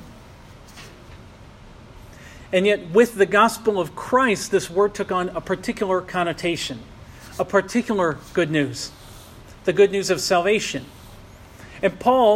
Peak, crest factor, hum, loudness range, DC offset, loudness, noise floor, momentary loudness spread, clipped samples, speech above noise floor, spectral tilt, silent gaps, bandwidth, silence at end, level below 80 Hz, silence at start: -4 dBFS; 18 dB; none; 4 LU; under 0.1%; -21 LUFS; -44 dBFS; 24 LU; under 0.1%; 24 dB; -4.5 dB/octave; none; 15.5 kHz; 0 s; -50 dBFS; 0 s